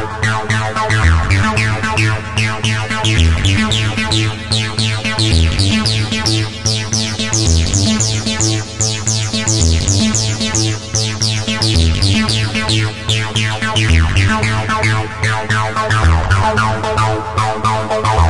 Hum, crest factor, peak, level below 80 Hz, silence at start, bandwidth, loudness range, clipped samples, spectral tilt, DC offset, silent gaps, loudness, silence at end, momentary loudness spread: none; 14 dB; 0 dBFS; -26 dBFS; 0 s; 11.5 kHz; 1 LU; under 0.1%; -4 dB/octave; 2%; none; -14 LUFS; 0 s; 4 LU